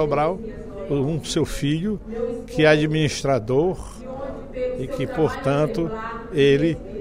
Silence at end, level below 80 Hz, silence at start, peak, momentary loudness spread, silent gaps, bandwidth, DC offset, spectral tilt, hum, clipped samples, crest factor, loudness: 0 s; -40 dBFS; 0 s; -4 dBFS; 15 LU; none; 15.5 kHz; under 0.1%; -6 dB/octave; none; under 0.1%; 18 dB; -22 LUFS